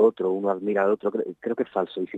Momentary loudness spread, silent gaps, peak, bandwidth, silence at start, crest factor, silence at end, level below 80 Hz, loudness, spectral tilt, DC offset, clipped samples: 6 LU; none; -8 dBFS; 4.1 kHz; 0 s; 18 dB; 0 s; -76 dBFS; -25 LUFS; -8.5 dB/octave; under 0.1%; under 0.1%